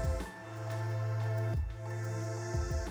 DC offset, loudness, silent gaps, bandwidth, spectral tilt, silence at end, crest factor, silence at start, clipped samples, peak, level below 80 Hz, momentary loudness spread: under 0.1%; -37 LUFS; none; over 20 kHz; -6.5 dB/octave; 0 s; 12 dB; 0 s; under 0.1%; -22 dBFS; -42 dBFS; 6 LU